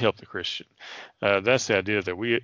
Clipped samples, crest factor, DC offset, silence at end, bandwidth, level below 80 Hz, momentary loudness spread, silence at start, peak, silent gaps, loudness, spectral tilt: under 0.1%; 20 dB; under 0.1%; 0 s; 10 kHz; -64 dBFS; 19 LU; 0 s; -6 dBFS; none; -25 LUFS; -4 dB/octave